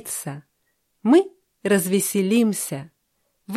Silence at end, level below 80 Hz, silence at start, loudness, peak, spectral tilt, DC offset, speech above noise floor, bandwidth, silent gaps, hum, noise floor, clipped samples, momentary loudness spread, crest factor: 0 s; -70 dBFS; 0.05 s; -21 LUFS; -6 dBFS; -5 dB/octave; under 0.1%; 50 dB; 15 kHz; none; none; -71 dBFS; under 0.1%; 16 LU; 18 dB